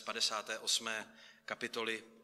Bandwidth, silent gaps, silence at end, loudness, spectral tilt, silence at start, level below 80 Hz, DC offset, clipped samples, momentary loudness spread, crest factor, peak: 15.5 kHz; none; 0 s; -37 LUFS; 0 dB/octave; 0 s; -86 dBFS; under 0.1%; under 0.1%; 13 LU; 22 dB; -18 dBFS